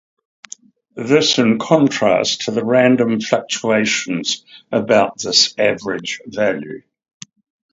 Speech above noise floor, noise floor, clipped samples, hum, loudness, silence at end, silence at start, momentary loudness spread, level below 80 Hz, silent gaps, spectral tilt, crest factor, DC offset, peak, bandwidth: 25 dB; -41 dBFS; under 0.1%; none; -16 LUFS; 0.95 s; 0.95 s; 15 LU; -60 dBFS; none; -3.5 dB/octave; 18 dB; under 0.1%; 0 dBFS; 7.8 kHz